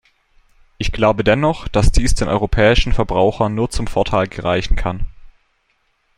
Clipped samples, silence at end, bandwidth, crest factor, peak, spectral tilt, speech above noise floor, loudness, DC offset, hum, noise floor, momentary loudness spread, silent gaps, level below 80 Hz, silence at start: under 0.1%; 0.85 s; 12 kHz; 16 dB; -2 dBFS; -5.5 dB/octave; 49 dB; -17 LUFS; under 0.1%; none; -64 dBFS; 10 LU; none; -22 dBFS; 0.8 s